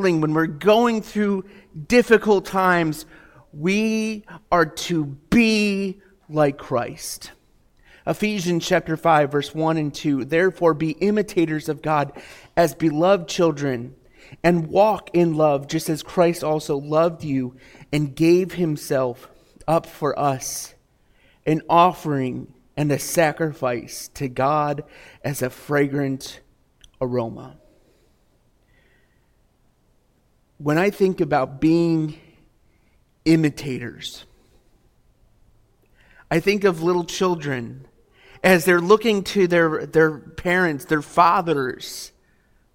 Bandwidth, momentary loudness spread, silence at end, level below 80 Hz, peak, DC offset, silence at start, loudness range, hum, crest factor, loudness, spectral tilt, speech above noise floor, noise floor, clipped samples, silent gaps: 17 kHz; 14 LU; 0.65 s; -52 dBFS; -2 dBFS; under 0.1%; 0 s; 7 LU; none; 20 dB; -21 LUFS; -5.5 dB/octave; 41 dB; -62 dBFS; under 0.1%; none